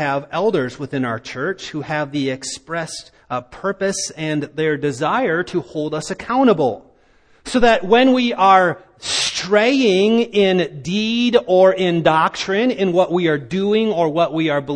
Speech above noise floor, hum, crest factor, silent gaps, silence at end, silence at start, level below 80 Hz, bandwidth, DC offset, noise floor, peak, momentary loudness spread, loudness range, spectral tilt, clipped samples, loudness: 36 dB; none; 18 dB; none; 0 s; 0 s; -48 dBFS; 10.5 kHz; under 0.1%; -53 dBFS; 0 dBFS; 12 LU; 8 LU; -4.5 dB/octave; under 0.1%; -18 LUFS